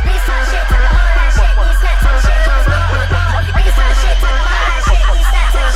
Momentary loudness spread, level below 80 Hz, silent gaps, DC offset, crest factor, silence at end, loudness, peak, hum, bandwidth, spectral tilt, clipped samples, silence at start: 2 LU; -10 dBFS; none; under 0.1%; 10 dB; 0 s; -13 LUFS; 0 dBFS; none; 12.5 kHz; -4.5 dB/octave; under 0.1%; 0 s